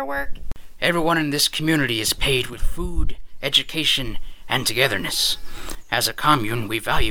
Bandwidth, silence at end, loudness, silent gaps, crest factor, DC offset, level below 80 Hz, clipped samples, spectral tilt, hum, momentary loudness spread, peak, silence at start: 19 kHz; 0 s; -21 LUFS; none; 20 dB; under 0.1%; -30 dBFS; under 0.1%; -3 dB/octave; none; 13 LU; -2 dBFS; 0 s